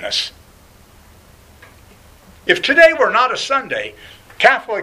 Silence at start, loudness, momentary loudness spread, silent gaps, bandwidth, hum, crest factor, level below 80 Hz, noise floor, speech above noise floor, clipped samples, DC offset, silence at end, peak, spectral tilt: 0 s; -14 LUFS; 16 LU; none; 15.5 kHz; none; 18 dB; -50 dBFS; -46 dBFS; 31 dB; under 0.1%; under 0.1%; 0 s; 0 dBFS; -2 dB/octave